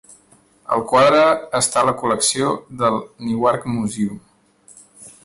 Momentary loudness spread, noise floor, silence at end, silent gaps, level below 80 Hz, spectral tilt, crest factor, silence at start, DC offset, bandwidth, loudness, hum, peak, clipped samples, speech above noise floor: 12 LU; -54 dBFS; 0.15 s; none; -56 dBFS; -3.5 dB/octave; 16 dB; 0.7 s; under 0.1%; 11.5 kHz; -18 LUFS; none; -4 dBFS; under 0.1%; 36 dB